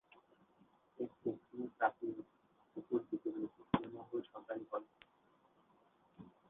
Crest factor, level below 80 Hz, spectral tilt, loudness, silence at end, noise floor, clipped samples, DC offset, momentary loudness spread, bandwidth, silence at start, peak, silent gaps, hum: 26 dB; -74 dBFS; -5.5 dB/octave; -43 LUFS; 0.2 s; -73 dBFS; under 0.1%; under 0.1%; 16 LU; 3.9 kHz; 1 s; -18 dBFS; none; none